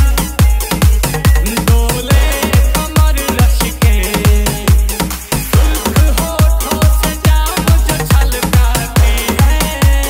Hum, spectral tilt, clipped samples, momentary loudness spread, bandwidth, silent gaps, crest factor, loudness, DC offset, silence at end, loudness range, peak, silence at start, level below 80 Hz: none; -4.5 dB/octave; under 0.1%; 1 LU; 16.5 kHz; none; 10 dB; -12 LUFS; under 0.1%; 0 s; 1 LU; 0 dBFS; 0 s; -12 dBFS